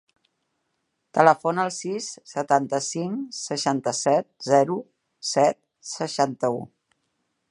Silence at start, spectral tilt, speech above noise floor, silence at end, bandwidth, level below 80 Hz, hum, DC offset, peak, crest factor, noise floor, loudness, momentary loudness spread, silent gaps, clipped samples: 1.15 s; -4 dB/octave; 53 dB; 0.85 s; 11.5 kHz; -76 dBFS; none; under 0.1%; -2 dBFS; 24 dB; -76 dBFS; -24 LUFS; 13 LU; none; under 0.1%